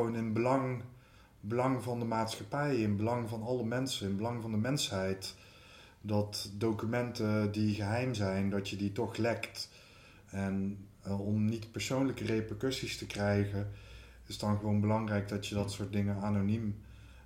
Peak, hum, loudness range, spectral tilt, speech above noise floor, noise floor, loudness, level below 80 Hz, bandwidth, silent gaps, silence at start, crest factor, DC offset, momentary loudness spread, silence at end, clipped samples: -16 dBFS; none; 2 LU; -6 dB/octave; 25 dB; -59 dBFS; -35 LUFS; -60 dBFS; 16 kHz; none; 0 s; 18 dB; under 0.1%; 12 LU; 0 s; under 0.1%